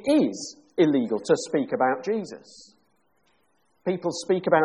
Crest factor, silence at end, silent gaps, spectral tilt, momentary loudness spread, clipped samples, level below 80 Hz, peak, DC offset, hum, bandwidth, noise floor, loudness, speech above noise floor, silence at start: 18 dB; 0 s; none; -5.5 dB/octave; 11 LU; under 0.1%; -70 dBFS; -6 dBFS; under 0.1%; none; 11 kHz; -69 dBFS; -25 LUFS; 46 dB; 0 s